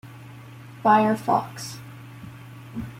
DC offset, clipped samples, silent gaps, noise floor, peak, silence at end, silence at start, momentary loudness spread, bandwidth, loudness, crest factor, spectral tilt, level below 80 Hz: under 0.1%; under 0.1%; none; -43 dBFS; -4 dBFS; 0 s; 0.05 s; 24 LU; 16.5 kHz; -22 LUFS; 22 dB; -6 dB/octave; -58 dBFS